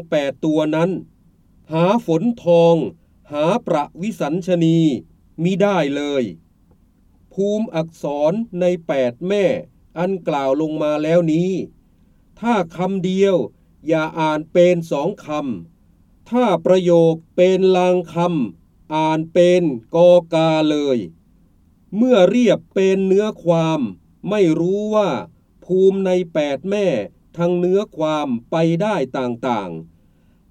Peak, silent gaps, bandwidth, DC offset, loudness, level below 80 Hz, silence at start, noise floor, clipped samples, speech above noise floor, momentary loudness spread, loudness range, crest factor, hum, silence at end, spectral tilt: 0 dBFS; none; 9.4 kHz; under 0.1%; -18 LUFS; -56 dBFS; 0 s; -54 dBFS; under 0.1%; 37 dB; 11 LU; 4 LU; 18 dB; none; 0.65 s; -7 dB/octave